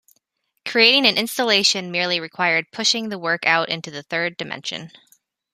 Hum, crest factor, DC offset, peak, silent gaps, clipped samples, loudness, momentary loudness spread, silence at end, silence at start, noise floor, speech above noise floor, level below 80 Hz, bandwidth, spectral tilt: none; 22 dB; under 0.1%; 0 dBFS; none; under 0.1%; -19 LUFS; 14 LU; 0.65 s; 0.65 s; -70 dBFS; 49 dB; -72 dBFS; 15 kHz; -2 dB/octave